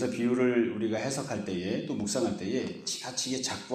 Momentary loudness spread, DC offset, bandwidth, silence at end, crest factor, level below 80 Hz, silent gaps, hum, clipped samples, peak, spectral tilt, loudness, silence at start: 7 LU; under 0.1%; 15 kHz; 0 s; 16 dB; -66 dBFS; none; none; under 0.1%; -14 dBFS; -4 dB/octave; -31 LUFS; 0 s